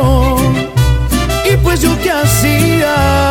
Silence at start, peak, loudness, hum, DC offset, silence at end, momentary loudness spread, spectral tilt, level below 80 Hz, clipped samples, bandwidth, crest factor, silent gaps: 0 s; 0 dBFS; -12 LUFS; none; under 0.1%; 0 s; 3 LU; -5 dB/octave; -18 dBFS; under 0.1%; 18.5 kHz; 10 dB; none